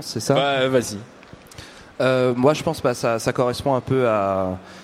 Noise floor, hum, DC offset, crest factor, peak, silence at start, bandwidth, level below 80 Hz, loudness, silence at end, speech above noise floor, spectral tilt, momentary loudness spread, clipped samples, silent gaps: -42 dBFS; none; under 0.1%; 18 dB; -4 dBFS; 0 s; 16 kHz; -52 dBFS; -21 LUFS; 0 s; 21 dB; -5 dB/octave; 17 LU; under 0.1%; none